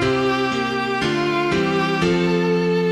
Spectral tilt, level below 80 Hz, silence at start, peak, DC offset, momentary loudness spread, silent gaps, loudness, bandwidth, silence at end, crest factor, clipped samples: -6 dB/octave; -46 dBFS; 0 s; -6 dBFS; under 0.1%; 2 LU; none; -19 LUFS; 11.5 kHz; 0 s; 12 dB; under 0.1%